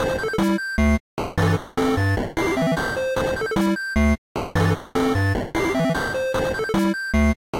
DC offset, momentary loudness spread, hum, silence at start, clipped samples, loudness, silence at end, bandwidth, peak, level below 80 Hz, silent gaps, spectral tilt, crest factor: under 0.1%; 3 LU; none; 0 s; under 0.1%; -22 LUFS; 0 s; 16.5 kHz; -10 dBFS; -32 dBFS; 1.00-1.17 s, 4.18-4.35 s, 7.36-7.53 s; -6 dB/octave; 12 dB